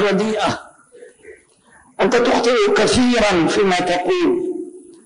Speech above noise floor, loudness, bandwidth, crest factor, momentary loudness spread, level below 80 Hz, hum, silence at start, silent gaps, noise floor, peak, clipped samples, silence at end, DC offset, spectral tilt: 35 dB; -16 LUFS; 10.5 kHz; 12 dB; 10 LU; -46 dBFS; none; 0 s; none; -51 dBFS; -6 dBFS; under 0.1%; 0.25 s; under 0.1%; -4.5 dB/octave